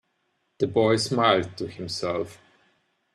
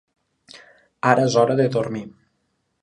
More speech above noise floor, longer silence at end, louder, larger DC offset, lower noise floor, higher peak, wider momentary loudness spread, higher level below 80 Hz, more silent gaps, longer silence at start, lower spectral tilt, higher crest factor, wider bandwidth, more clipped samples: about the same, 49 dB vs 52 dB; about the same, 0.8 s vs 0.75 s; second, -24 LUFS vs -19 LUFS; neither; about the same, -73 dBFS vs -71 dBFS; second, -6 dBFS vs 0 dBFS; about the same, 13 LU vs 15 LU; about the same, -64 dBFS vs -64 dBFS; neither; about the same, 0.6 s vs 0.55 s; about the same, -5 dB/octave vs -6 dB/octave; about the same, 20 dB vs 22 dB; first, 13 kHz vs 11 kHz; neither